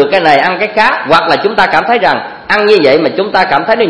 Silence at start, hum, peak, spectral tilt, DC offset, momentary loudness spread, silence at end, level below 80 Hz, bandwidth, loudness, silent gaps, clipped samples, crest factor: 0 s; none; 0 dBFS; -5 dB/octave; 0.6%; 4 LU; 0 s; -46 dBFS; 11 kHz; -9 LUFS; none; 1%; 10 dB